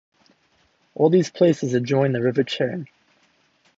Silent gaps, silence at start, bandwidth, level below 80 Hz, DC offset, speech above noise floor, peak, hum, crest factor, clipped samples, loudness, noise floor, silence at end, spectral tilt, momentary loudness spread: none; 1 s; 7.8 kHz; -68 dBFS; under 0.1%; 43 dB; -4 dBFS; none; 18 dB; under 0.1%; -21 LUFS; -63 dBFS; 0.9 s; -6.5 dB/octave; 14 LU